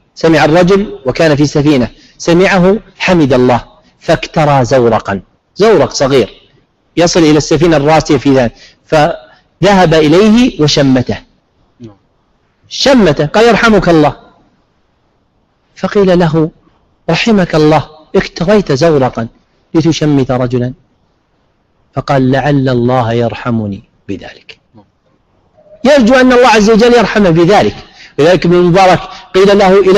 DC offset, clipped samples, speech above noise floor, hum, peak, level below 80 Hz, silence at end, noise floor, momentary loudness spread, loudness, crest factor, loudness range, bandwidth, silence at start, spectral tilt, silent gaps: under 0.1%; under 0.1%; 48 dB; none; 0 dBFS; -34 dBFS; 0 s; -56 dBFS; 13 LU; -9 LUFS; 10 dB; 6 LU; 13 kHz; 0.2 s; -6 dB/octave; none